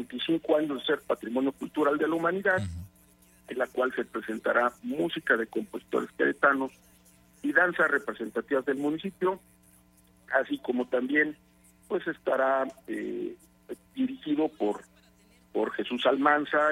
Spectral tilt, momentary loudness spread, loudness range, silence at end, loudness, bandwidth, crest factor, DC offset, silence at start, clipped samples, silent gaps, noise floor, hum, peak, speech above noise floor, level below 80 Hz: -5.5 dB/octave; 11 LU; 4 LU; 0 s; -28 LUFS; 16 kHz; 22 dB; under 0.1%; 0 s; under 0.1%; none; -61 dBFS; none; -8 dBFS; 33 dB; -64 dBFS